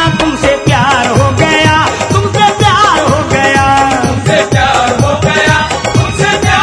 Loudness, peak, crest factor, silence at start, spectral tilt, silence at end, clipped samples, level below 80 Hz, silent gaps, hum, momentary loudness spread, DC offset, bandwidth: -9 LUFS; 0 dBFS; 8 dB; 0 s; -4.5 dB/octave; 0 s; 0.7%; -28 dBFS; none; none; 3 LU; under 0.1%; 11 kHz